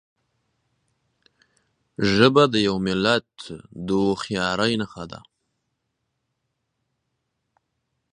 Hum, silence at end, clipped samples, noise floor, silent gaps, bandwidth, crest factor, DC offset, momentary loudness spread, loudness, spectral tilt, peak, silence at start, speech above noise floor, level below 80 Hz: none; 2.95 s; under 0.1%; -77 dBFS; none; 10.5 kHz; 24 dB; under 0.1%; 22 LU; -21 LUFS; -5.5 dB/octave; 0 dBFS; 2 s; 56 dB; -56 dBFS